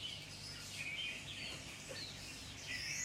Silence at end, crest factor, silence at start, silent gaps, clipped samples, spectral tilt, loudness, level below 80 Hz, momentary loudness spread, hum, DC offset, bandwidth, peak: 0 s; 16 dB; 0 s; none; under 0.1%; -1.5 dB/octave; -45 LUFS; -64 dBFS; 6 LU; 50 Hz at -65 dBFS; under 0.1%; 16 kHz; -30 dBFS